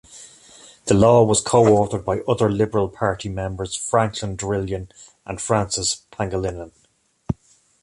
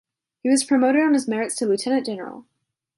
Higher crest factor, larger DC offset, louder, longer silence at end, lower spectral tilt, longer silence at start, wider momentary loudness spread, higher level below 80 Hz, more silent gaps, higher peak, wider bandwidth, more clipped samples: about the same, 18 dB vs 16 dB; neither; about the same, -20 LUFS vs -21 LUFS; about the same, 0.5 s vs 0.55 s; first, -5 dB/octave vs -3.5 dB/octave; second, 0.15 s vs 0.45 s; first, 18 LU vs 13 LU; first, -42 dBFS vs -74 dBFS; neither; first, -2 dBFS vs -6 dBFS; about the same, 11.5 kHz vs 11.5 kHz; neither